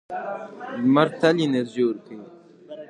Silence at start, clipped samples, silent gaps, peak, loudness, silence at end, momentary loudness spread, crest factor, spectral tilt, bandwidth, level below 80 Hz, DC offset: 0.1 s; under 0.1%; none; -4 dBFS; -22 LUFS; 0.05 s; 21 LU; 20 dB; -6.5 dB/octave; 10 kHz; -74 dBFS; under 0.1%